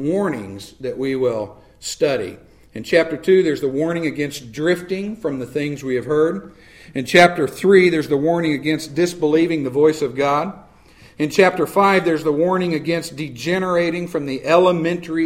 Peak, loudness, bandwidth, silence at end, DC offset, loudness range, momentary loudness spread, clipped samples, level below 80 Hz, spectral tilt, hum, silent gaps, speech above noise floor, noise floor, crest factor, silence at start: 0 dBFS; -18 LUFS; 16 kHz; 0 s; under 0.1%; 4 LU; 13 LU; under 0.1%; -54 dBFS; -5.5 dB/octave; none; none; 29 dB; -47 dBFS; 18 dB; 0 s